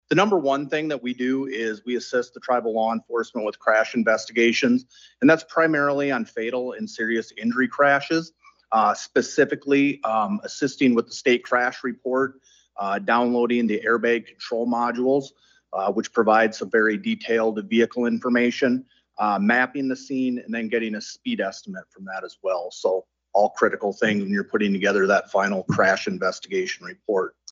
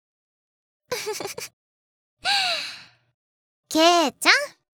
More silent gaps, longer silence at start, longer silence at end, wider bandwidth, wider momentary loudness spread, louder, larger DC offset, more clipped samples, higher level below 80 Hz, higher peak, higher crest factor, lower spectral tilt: second, none vs 1.53-2.17 s, 3.14-3.63 s; second, 0.1 s vs 0.9 s; about the same, 0.2 s vs 0.25 s; second, 7.8 kHz vs over 20 kHz; second, 9 LU vs 17 LU; about the same, -23 LUFS vs -21 LUFS; neither; neither; about the same, -72 dBFS vs -68 dBFS; second, -4 dBFS vs 0 dBFS; second, 18 dB vs 26 dB; first, -5 dB/octave vs -1 dB/octave